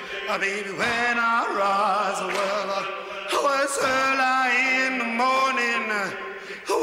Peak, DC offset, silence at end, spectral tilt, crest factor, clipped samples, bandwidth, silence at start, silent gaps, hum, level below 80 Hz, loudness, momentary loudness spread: -10 dBFS; under 0.1%; 0 s; -2 dB/octave; 14 dB; under 0.1%; 16 kHz; 0 s; none; none; -64 dBFS; -23 LUFS; 8 LU